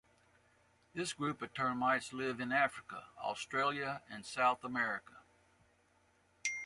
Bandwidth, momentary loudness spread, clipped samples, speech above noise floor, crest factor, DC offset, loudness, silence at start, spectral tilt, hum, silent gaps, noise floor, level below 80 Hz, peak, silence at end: 11.5 kHz; 11 LU; under 0.1%; 35 dB; 20 dB; under 0.1%; -37 LUFS; 0.95 s; -3.5 dB/octave; none; none; -72 dBFS; -76 dBFS; -18 dBFS; 0 s